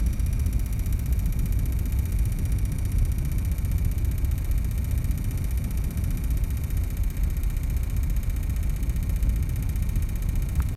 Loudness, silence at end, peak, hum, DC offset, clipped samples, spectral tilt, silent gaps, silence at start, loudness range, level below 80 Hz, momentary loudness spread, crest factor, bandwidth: -28 LUFS; 0 s; -12 dBFS; none; under 0.1%; under 0.1%; -6.5 dB/octave; none; 0 s; 1 LU; -26 dBFS; 2 LU; 12 dB; 15.5 kHz